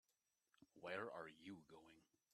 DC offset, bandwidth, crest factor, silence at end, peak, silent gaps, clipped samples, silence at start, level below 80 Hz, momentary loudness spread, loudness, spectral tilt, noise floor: under 0.1%; 12.5 kHz; 24 dB; 0.3 s; -34 dBFS; none; under 0.1%; 0.6 s; under -90 dBFS; 15 LU; -54 LUFS; -5 dB/octave; -90 dBFS